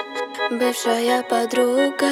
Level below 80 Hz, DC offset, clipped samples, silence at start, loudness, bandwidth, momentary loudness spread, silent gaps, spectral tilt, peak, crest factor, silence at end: -74 dBFS; under 0.1%; under 0.1%; 0 s; -20 LUFS; 17 kHz; 6 LU; none; -2 dB/octave; -6 dBFS; 14 dB; 0 s